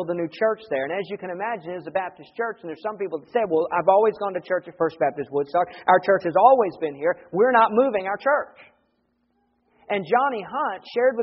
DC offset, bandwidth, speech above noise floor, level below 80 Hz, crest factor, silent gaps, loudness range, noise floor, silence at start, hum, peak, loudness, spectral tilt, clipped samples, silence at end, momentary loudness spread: under 0.1%; 5.8 kHz; 47 dB; -70 dBFS; 20 dB; none; 7 LU; -70 dBFS; 0 s; none; -2 dBFS; -23 LUFS; -3.5 dB/octave; under 0.1%; 0 s; 12 LU